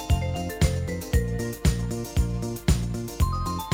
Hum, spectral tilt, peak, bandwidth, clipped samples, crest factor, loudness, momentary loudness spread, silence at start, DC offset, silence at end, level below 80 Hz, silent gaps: none; -5.5 dB/octave; -8 dBFS; 17 kHz; under 0.1%; 18 dB; -27 LUFS; 4 LU; 0 s; under 0.1%; 0 s; -30 dBFS; none